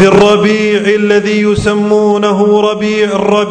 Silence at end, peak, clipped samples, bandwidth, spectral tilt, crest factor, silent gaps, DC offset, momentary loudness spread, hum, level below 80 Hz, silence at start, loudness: 0 s; 0 dBFS; 1%; 9.4 kHz; -5.5 dB/octave; 8 dB; none; under 0.1%; 4 LU; none; -38 dBFS; 0 s; -10 LUFS